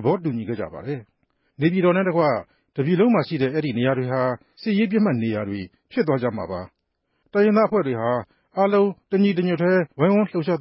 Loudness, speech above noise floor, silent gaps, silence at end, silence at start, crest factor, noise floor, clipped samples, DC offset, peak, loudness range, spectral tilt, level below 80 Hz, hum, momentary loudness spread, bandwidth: -22 LUFS; 52 dB; none; 0 s; 0 s; 14 dB; -73 dBFS; under 0.1%; under 0.1%; -6 dBFS; 3 LU; -12 dB/octave; -58 dBFS; none; 11 LU; 5.8 kHz